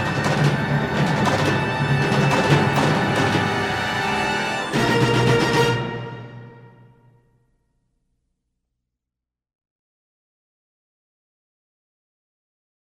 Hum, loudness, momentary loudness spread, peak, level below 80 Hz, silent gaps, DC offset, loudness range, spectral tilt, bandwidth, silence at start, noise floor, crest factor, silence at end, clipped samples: 60 Hz at -50 dBFS; -19 LUFS; 5 LU; -4 dBFS; -48 dBFS; none; under 0.1%; 6 LU; -5.5 dB/octave; 16 kHz; 0 s; -86 dBFS; 18 dB; 6.2 s; under 0.1%